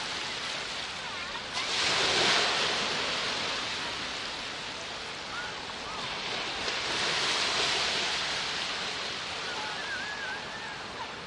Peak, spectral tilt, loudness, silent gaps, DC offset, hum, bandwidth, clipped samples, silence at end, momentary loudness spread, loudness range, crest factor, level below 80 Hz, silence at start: -14 dBFS; -1 dB/octave; -30 LUFS; none; under 0.1%; none; 11.5 kHz; under 0.1%; 0 s; 11 LU; 6 LU; 18 dB; -60 dBFS; 0 s